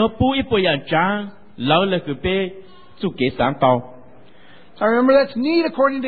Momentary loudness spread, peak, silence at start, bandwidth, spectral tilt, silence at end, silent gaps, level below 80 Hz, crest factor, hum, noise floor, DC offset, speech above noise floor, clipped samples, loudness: 11 LU; -2 dBFS; 0 s; 4.8 kHz; -11 dB/octave; 0 s; none; -44 dBFS; 16 dB; none; -48 dBFS; 0.9%; 30 dB; under 0.1%; -19 LUFS